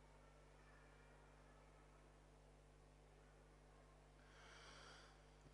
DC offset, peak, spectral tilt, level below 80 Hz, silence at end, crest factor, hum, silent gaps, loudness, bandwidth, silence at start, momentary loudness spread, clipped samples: under 0.1%; -50 dBFS; -4 dB/octave; -70 dBFS; 0 s; 16 dB; 50 Hz at -70 dBFS; none; -67 LUFS; 11 kHz; 0 s; 7 LU; under 0.1%